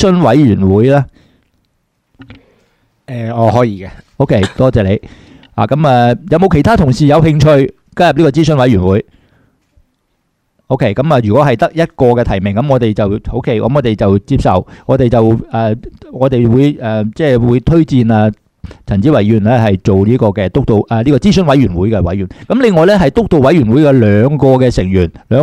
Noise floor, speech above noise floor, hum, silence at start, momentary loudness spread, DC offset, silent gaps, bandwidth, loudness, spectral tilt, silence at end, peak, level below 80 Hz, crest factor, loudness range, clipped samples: -63 dBFS; 53 dB; none; 0 s; 8 LU; under 0.1%; none; 11 kHz; -10 LUFS; -8 dB/octave; 0 s; 0 dBFS; -30 dBFS; 10 dB; 5 LU; 0.2%